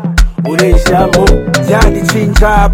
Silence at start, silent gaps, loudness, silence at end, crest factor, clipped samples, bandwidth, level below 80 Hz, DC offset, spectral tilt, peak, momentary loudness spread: 0 s; none; -10 LUFS; 0 s; 8 dB; 4%; 16.5 kHz; -12 dBFS; under 0.1%; -5.5 dB/octave; 0 dBFS; 4 LU